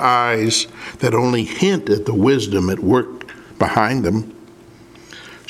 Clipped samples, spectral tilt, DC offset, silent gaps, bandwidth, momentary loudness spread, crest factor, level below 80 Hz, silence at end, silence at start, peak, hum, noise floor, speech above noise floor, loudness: under 0.1%; -5 dB/octave; under 0.1%; none; 15.5 kHz; 17 LU; 18 dB; -50 dBFS; 0.1 s; 0 s; 0 dBFS; none; -43 dBFS; 26 dB; -17 LUFS